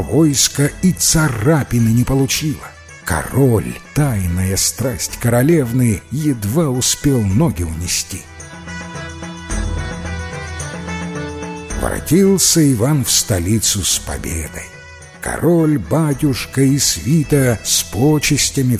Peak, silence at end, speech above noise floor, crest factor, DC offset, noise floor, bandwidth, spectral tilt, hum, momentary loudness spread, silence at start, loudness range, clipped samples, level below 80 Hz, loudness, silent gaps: 0 dBFS; 0 s; 22 dB; 16 dB; under 0.1%; -37 dBFS; 16 kHz; -4.5 dB/octave; none; 14 LU; 0 s; 9 LU; under 0.1%; -32 dBFS; -16 LUFS; none